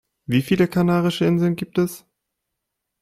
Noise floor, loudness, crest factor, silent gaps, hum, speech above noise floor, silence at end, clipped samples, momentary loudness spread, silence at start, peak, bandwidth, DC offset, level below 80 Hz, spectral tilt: -80 dBFS; -20 LUFS; 16 dB; none; none; 61 dB; 1.05 s; under 0.1%; 6 LU; 0.3 s; -4 dBFS; 15.5 kHz; under 0.1%; -54 dBFS; -7 dB/octave